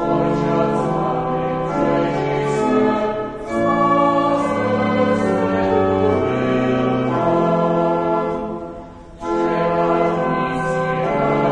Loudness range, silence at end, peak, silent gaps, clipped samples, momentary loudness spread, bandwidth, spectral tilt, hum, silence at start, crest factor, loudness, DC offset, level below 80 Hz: 2 LU; 0 s; -4 dBFS; none; under 0.1%; 6 LU; 10 kHz; -7.5 dB/octave; none; 0 s; 14 dB; -18 LUFS; under 0.1%; -44 dBFS